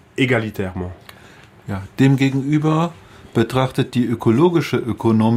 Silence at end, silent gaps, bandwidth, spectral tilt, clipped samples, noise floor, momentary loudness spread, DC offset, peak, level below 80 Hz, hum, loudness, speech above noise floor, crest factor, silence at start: 0 s; none; 15.5 kHz; -7.5 dB/octave; under 0.1%; -45 dBFS; 14 LU; under 0.1%; -4 dBFS; -50 dBFS; none; -18 LUFS; 27 dB; 14 dB; 0.15 s